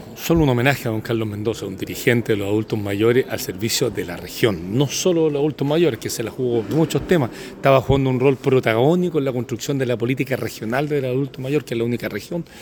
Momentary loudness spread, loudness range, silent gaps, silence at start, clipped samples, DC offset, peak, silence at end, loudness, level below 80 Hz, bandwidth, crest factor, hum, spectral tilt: 8 LU; 3 LU; none; 0 s; under 0.1%; under 0.1%; 0 dBFS; 0 s; -20 LUFS; -44 dBFS; 19.5 kHz; 20 dB; none; -5.5 dB/octave